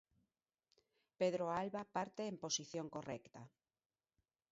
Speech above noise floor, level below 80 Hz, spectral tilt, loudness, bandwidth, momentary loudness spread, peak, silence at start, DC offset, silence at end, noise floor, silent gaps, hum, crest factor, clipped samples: over 47 dB; -82 dBFS; -4 dB/octave; -43 LUFS; 7.6 kHz; 12 LU; -24 dBFS; 1.2 s; under 0.1%; 1.05 s; under -90 dBFS; none; none; 20 dB; under 0.1%